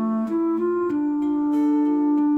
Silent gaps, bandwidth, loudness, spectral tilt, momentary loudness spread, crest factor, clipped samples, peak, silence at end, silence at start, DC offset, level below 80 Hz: none; 3.4 kHz; -22 LUFS; -9 dB/octave; 3 LU; 8 dB; under 0.1%; -14 dBFS; 0 s; 0 s; under 0.1%; -66 dBFS